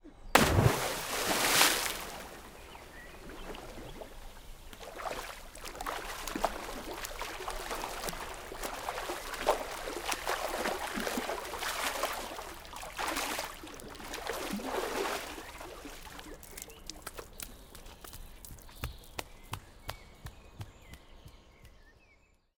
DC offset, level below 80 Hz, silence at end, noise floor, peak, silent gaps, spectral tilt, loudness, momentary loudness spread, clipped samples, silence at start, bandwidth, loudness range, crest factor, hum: under 0.1%; -50 dBFS; 0.65 s; -66 dBFS; -2 dBFS; none; -3 dB/octave; -34 LUFS; 21 LU; under 0.1%; 0 s; 18 kHz; 15 LU; 36 dB; none